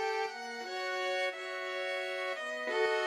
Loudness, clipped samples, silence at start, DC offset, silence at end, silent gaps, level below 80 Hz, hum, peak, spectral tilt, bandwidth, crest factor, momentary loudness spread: -35 LUFS; under 0.1%; 0 s; under 0.1%; 0 s; none; under -90 dBFS; none; -18 dBFS; -0.5 dB/octave; 15 kHz; 18 dB; 6 LU